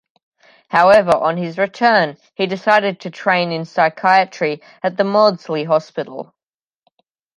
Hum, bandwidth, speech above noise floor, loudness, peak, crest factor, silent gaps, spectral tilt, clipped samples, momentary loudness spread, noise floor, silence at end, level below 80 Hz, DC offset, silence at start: none; 11 kHz; 60 dB; -16 LUFS; 0 dBFS; 16 dB; none; -5.5 dB/octave; under 0.1%; 11 LU; -76 dBFS; 1.15 s; -62 dBFS; under 0.1%; 0.7 s